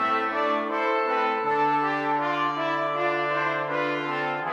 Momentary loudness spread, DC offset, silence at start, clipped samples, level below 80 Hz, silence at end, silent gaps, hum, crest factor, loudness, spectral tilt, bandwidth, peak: 3 LU; under 0.1%; 0 s; under 0.1%; -82 dBFS; 0 s; none; none; 12 dB; -25 LUFS; -5.5 dB/octave; 9 kHz; -12 dBFS